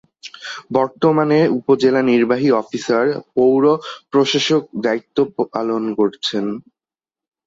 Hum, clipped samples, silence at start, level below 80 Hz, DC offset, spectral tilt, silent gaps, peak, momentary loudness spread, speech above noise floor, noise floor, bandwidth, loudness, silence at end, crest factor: none; under 0.1%; 0.25 s; -62 dBFS; under 0.1%; -5.5 dB/octave; none; -2 dBFS; 9 LU; over 73 dB; under -90 dBFS; 7.8 kHz; -17 LUFS; 0.85 s; 16 dB